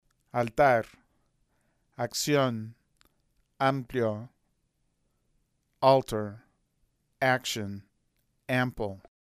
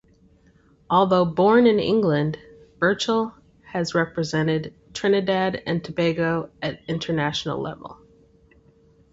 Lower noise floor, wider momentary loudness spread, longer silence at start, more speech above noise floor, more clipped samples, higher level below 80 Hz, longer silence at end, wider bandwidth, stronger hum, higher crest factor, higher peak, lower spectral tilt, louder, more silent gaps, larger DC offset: first, -75 dBFS vs -57 dBFS; first, 17 LU vs 13 LU; second, 0.35 s vs 0.9 s; first, 48 dB vs 35 dB; neither; about the same, -60 dBFS vs -56 dBFS; second, 0.25 s vs 1.2 s; first, 15.5 kHz vs 8 kHz; neither; about the same, 22 dB vs 18 dB; about the same, -8 dBFS vs -6 dBFS; about the same, -5 dB/octave vs -6 dB/octave; second, -28 LUFS vs -22 LUFS; neither; neither